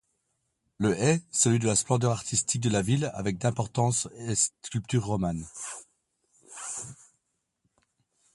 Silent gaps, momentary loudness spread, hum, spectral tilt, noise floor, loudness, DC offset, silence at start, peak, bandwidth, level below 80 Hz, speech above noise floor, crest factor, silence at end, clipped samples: none; 14 LU; none; -4.5 dB/octave; -78 dBFS; -27 LUFS; under 0.1%; 0.8 s; -10 dBFS; 11.5 kHz; -56 dBFS; 51 dB; 20 dB; 1.4 s; under 0.1%